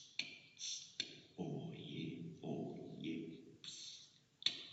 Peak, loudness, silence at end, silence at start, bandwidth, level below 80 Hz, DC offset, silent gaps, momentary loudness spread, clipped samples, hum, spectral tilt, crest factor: -18 dBFS; -47 LUFS; 0 s; 0 s; 8 kHz; -84 dBFS; under 0.1%; none; 11 LU; under 0.1%; none; -3.5 dB/octave; 30 dB